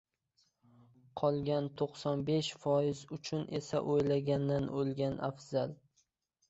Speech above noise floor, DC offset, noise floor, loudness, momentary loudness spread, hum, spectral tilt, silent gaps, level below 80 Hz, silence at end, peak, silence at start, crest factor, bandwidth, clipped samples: 44 dB; under 0.1%; -78 dBFS; -35 LUFS; 7 LU; none; -6.5 dB/octave; none; -66 dBFS; 0.75 s; -18 dBFS; 1.15 s; 18 dB; 8 kHz; under 0.1%